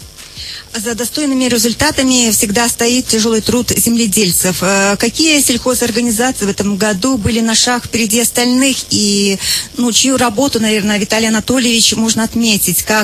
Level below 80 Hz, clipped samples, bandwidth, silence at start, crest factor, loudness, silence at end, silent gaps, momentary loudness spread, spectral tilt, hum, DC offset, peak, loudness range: -38 dBFS; under 0.1%; 15 kHz; 0 s; 12 dB; -12 LUFS; 0 s; none; 5 LU; -2.5 dB/octave; none; under 0.1%; 0 dBFS; 1 LU